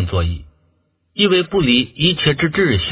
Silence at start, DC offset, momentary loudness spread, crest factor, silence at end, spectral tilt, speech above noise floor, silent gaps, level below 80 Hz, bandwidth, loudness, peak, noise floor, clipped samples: 0 s; under 0.1%; 9 LU; 16 dB; 0 s; -10 dB/octave; 46 dB; none; -32 dBFS; 4 kHz; -16 LUFS; 0 dBFS; -62 dBFS; under 0.1%